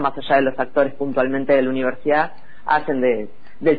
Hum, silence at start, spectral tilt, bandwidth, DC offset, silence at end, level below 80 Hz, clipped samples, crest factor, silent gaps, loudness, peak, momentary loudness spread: none; 0 s; -9 dB/octave; 5 kHz; 4%; 0 s; -54 dBFS; under 0.1%; 14 dB; none; -20 LUFS; -4 dBFS; 7 LU